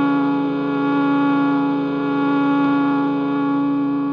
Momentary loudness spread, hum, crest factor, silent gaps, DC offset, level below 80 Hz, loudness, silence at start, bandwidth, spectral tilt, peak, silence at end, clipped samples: 3 LU; none; 10 dB; none; under 0.1%; -60 dBFS; -19 LUFS; 0 s; 5.2 kHz; -8.5 dB/octave; -8 dBFS; 0 s; under 0.1%